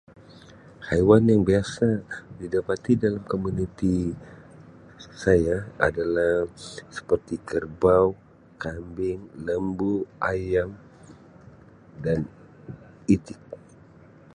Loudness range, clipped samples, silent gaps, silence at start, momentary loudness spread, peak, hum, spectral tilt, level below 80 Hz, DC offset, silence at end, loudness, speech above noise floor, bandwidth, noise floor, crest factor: 7 LU; under 0.1%; none; 0.8 s; 20 LU; -4 dBFS; none; -7.5 dB/octave; -46 dBFS; under 0.1%; 0.8 s; -24 LUFS; 27 dB; 10.5 kHz; -51 dBFS; 22 dB